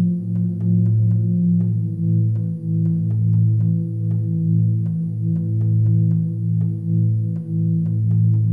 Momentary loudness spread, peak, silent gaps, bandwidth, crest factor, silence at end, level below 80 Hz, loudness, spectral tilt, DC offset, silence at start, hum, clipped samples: 5 LU; -8 dBFS; none; 0.9 kHz; 10 dB; 0 s; -62 dBFS; -19 LUFS; -13.5 dB/octave; 0.1%; 0 s; none; under 0.1%